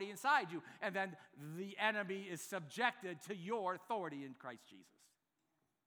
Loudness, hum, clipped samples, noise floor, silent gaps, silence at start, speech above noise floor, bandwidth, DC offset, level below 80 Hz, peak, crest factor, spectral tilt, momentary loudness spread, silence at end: -41 LUFS; none; under 0.1%; -85 dBFS; none; 0 s; 43 dB; over 20 kHz; under 0.1%; under -90 dBFS; -20 dBFS; 24 dB; -4 dB/octave; 16 LU; 1.05 s